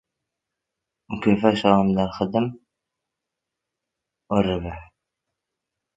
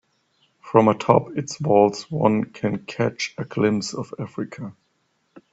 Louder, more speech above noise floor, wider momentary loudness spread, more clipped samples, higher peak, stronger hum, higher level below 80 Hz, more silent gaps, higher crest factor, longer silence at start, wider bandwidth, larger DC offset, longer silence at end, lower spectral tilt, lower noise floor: about the same, -22 LUFS vs -22 LUFS; first, 63 dB vs 48 dB; about the same, 14 LU vs 14 LU; neither; about the same, 0 dBFS vs 0 dBFS; neither; first, -48 dBFS vs -60 dBFS; neither; about the same, 24 dB vs 22 dB; first, 1.1 s vs 0.65 s; about the same, 7.8 kHz vs 8 kHz; neither; first, 1.15 s vs 0.15 s; first, -7.5 dB/octave vs -6 dB/octave; first, -84 dBFS vs -69 dBFS